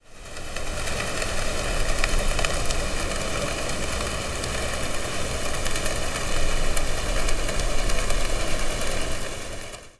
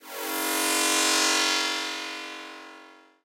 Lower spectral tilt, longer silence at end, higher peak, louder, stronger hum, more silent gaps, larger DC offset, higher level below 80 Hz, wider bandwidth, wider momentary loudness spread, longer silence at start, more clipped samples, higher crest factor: first, -3 dB/octave vs 2.5 dB/octave; second, 0.1 s vs 0.3 s; about the same, -4 dBFS vs -6 dBFS; second, -27 LUFS vs -23 LUFS; neither; neither; neither; first, -28 dBFS vs -76 dBFS; second, 11 kHz vs 17 kHz; second, 6 LU vs 18 LU; about the same, 0.1 s vs 0.05 s; neither; about the same, 18 dB vs 22 dB